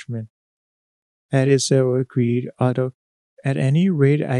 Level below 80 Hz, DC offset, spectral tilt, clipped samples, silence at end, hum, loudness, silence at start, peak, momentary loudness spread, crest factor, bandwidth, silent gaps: -68 dBFS; under 0.1%; -6.5 dB/octave; under 0.1%; 0 s; none; -20 LUFS; 0 s; -4 dBFS; 11 LU; 16 dB; 11.5 kHz; 0.30-1.29 s, 2.94-3.37 s